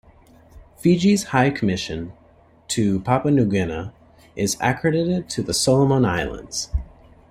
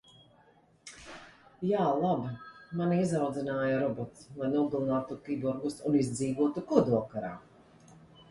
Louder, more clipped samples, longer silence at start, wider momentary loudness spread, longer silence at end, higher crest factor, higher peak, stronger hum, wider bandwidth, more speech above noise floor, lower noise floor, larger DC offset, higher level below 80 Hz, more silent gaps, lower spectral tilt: first, -21 LUFS vs -31 LUFS; neither; second, 0.55 s vs 0.85 s; second, 13 LU vs 19 LU; about the same, 0.45 s vs 0.35 s; about the same, 18 dB vs 22 dB; first, -4 dBFS vs -10 dBFS; neither; first, 16 kHz vs 11.5 kHz; about the same, 33 dB vs 33 dB; second, -53 dBFS vs -63 dBFS; neither; first, -40 dBFS vs -66 dBFS; neither; second, -5 dB/octave vs -7 dB/octave